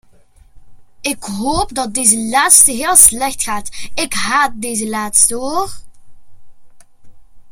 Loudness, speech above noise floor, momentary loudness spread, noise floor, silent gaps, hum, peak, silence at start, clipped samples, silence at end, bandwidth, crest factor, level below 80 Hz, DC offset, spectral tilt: -12 LUFS; 31 dB; 15 LU; -45 dBFS; none; none; 0 dBFS; 0.55 s; 0.3%; 0 s; over 20 kHz; 16 dB; -40 dBFS; under 0.1%; -1 dB/octave